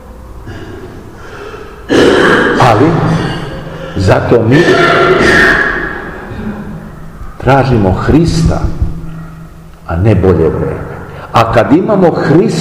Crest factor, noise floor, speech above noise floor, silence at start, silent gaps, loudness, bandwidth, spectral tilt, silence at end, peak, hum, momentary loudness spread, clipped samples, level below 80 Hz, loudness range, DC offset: 10 dB; -30 dBFS; 23 dB; 0 s; none; -9 LUFS; 15 kHz; -6.5 dB/octave; 0 s; 0 dBFS; none; 21 LU; 2%; -26 dBFS; 4 LU; 0.6%